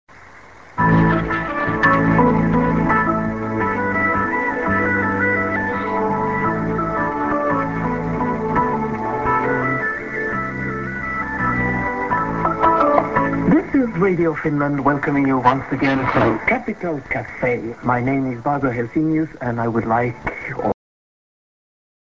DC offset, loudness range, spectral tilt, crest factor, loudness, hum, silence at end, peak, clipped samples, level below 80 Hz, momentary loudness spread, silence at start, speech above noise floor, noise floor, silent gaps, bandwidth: 0.3%; 4 LU; -8.5 dB/octave; 18 dB; -19 LUFS; none; 1.4 s; 0 dBFS; under 0.1%; -40 dBFS; 8 LU; 0.15 s; 24 dB; -43 dBFS; none; 7.6 kHz